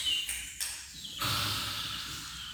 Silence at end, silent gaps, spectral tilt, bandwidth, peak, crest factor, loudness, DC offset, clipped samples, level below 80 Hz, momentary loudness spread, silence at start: 0 s; none; -1 dB/octave; over 20 kHz; -18 dBFS; 18 dB; -33 LUFS; under 0.1%; under 0.1%; -54 dBFS; 9 LU; 0 s